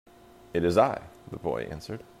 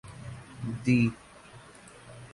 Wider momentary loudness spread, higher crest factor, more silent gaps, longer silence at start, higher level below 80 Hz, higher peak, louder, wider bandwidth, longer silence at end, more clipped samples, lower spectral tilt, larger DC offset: second, 16 LU vs 25 LU; about the same, 22 dB vs 20 dB; neither; first, 0.55 s vs 0.05 s; about the same, -56 dBFS vs -58 dBFS; first, -8 dBFS vs -12 dBFS; about the same, -28 LUFS vs -28 LUFS; first, 15.5 kHz vs 11.5 kHz; about the same, 0.15 s vs 0.05 s; neither; about the same, -6.5 dB/octave vs -7 dB/octave; neither